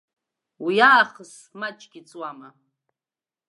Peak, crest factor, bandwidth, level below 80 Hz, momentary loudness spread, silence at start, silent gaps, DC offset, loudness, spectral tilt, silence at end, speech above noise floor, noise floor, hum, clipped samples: 0 dBFS; 24 dB; 11.5 kHz; -82 dBFS; 21 LU; 0.6 s; none; under 0.1%; -18 LUFS; -3.5 dB/octave; 1.15 s; over 68 dB; under -90 dBFS; none; under 0.1%